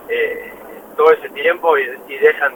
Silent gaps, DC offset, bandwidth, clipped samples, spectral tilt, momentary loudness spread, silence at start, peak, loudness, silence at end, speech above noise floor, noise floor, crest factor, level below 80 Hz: none; under 0.1%; 17.5 kHz; under 0.1%; -3.5 dB/octave; 16 LU; 0 s; 0 dBFS; -16 LUFS; 0 s; 21 dB; -35 dBFS; 16 dB; -60 dBFS